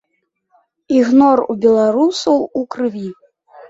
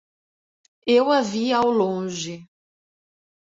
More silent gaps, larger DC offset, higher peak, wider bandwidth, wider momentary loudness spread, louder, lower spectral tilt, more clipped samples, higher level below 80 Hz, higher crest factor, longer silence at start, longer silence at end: neither; neither; first, -2 dBFS vs -6 dBFS; about the same, 7.8 kHz vs 7.8 kHz; second, 11 LU vs 14 LU; first, -14 LUFS vs -21 LUFS; about the same, -5.5 dB/octave vs -4.5 dB/octave; neither; first, -58 dBFS vs -66 dBFS; about the same, 14 dB vs 18 dB; about the same, 0.9 s vs 0.85 s; second, 0.05 s vs 1 s